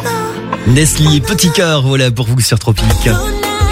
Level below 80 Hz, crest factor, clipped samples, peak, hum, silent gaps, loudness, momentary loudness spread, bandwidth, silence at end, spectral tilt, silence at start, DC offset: -22 dBFS; 12 dB; under 0.1%; 0 dBFS; none; none; -12 LUFS; 7 LU; 16.5 kHz; 0 s; -4.5 dB/octave; 0 s; under 0.1%